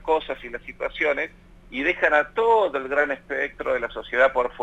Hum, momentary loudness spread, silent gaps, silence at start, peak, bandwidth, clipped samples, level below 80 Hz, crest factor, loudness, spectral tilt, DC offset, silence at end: none; 13 LU; none; 0 s; -6 dBFS; 9 kHz; under 0.1%; -50 dBFS; 18 dB; -23 LUFS; -4.5 dB/octave; under 0.1%; 0 s